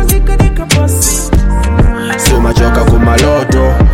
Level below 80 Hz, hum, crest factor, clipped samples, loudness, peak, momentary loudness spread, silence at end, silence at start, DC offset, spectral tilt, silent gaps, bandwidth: -12 dBFS; none; 8 dB; under 0.1%; -10 LUFS; 0 dBFS; 4 LU; 0 s; 0 s; under 0.1%; -5 dB/octave; none; 17 kHz